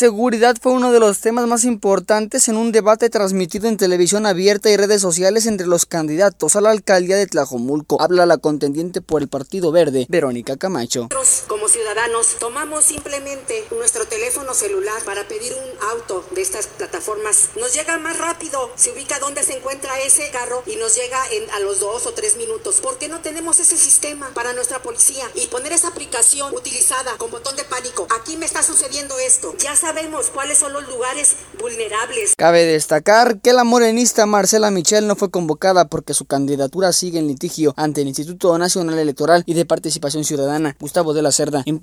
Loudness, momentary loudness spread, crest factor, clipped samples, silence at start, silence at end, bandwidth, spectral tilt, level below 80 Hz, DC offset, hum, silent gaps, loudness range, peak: -16 LUFS; 10 LU; 18 dB; under 0.1%; 0 s; 0 s; 19.5 kHz; -2.5 dB/octave; -54 dBFS; under 0.1%; none; none; 5 LU; 0 dBFS